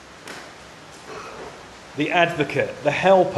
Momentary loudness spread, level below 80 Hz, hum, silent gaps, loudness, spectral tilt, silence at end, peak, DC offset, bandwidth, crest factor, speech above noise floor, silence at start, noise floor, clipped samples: 23 LU; -58 dBFS; none; none; -20 LUFS; -5 dB/octave; 0 s; -4 dBFS; under 0.1%; 12.5 kHz; 18 dB; 23 dB; 0 s; -42 dBFS; under 0.1%